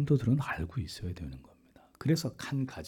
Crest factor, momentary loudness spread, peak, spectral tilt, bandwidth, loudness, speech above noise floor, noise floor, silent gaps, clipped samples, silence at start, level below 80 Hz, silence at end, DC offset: 16 dB; 15 LU; -16 dBFS; -6.5 dB/octave; 17.5 kHz; -33 LUFS; 29 dB; -61 dBFS; none; under 0.1%; 0 s; -54 dBFS; 0 s; under 0.1%